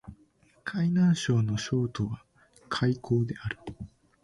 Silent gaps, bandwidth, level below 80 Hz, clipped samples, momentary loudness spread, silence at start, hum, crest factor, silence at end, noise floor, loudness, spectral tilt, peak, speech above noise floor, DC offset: none; 11.5 kHz; -54 dBFS; under 0.1%; 18 LU; 0.05 s; none; 14 dB; 0.35 s; -63 dBFS; -29 LUFS; -6.5 dB/octave; -14 dBFS; 36 dB; under 0.1%